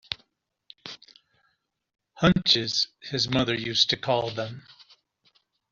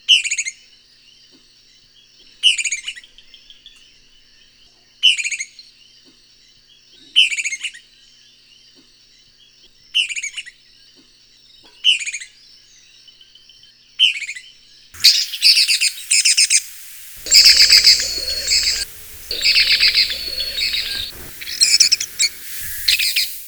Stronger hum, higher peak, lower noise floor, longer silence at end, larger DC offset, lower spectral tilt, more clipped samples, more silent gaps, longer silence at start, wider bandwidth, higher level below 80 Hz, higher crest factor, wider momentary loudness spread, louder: neither; second, -4 dBFS vs 0 dBFS; first, -74 dBFS vs -51 dBFS; first, 1.1 s vs 0 s; neither; first, -3 dB/octave vs 3.5 dB/octave; neither; neither; about the same, 0.1 s vs 0.1 s; second, 7.4 kHz vs over 20 kHz; second, -56 dBFS vs -48 dBFS; about the same, 24 dB vs 20 dB; first, 21 LU vs 18 LU; second, -24 LUFS vs -13 LUFS